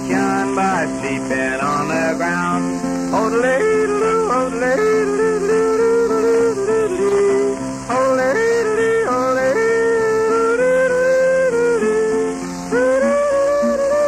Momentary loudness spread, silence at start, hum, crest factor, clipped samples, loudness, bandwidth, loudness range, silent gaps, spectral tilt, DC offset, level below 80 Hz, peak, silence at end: 4 LU; 0 s; none; 10 dB; under 0.1%; -17 LUFS; 13.5 kHz; 2 LU; none; -5 dB/octave; under 0.1%; -46 dBFS; -6 dBFS; 0 s